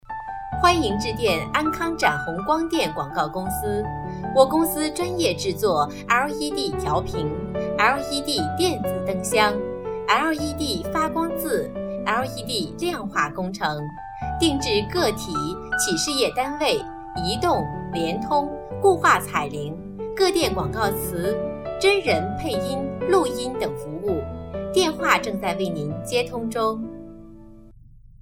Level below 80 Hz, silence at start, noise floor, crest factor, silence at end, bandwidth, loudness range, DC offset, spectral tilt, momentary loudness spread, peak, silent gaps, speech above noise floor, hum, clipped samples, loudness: -42 dBFS; 0.05 s; -47 dBFS; 22 dB; 0.25 s; 18.5 kHz; 2 LU; under 0.1%; -4 dB/octave; 9 LU; -2 dBFS; none; 24 dB; none; under 0.1%; -23 LUFS